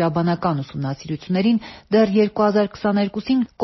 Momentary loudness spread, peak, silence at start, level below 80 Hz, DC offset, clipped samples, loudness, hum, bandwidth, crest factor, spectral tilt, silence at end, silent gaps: 9 LU; -4 dBFS; 0 s; -54 dBFS; under 0.1%; under 0.1%; -20 LUFS; none; 6 kHz; 14 dB; -6 dB/octave; 0 s; none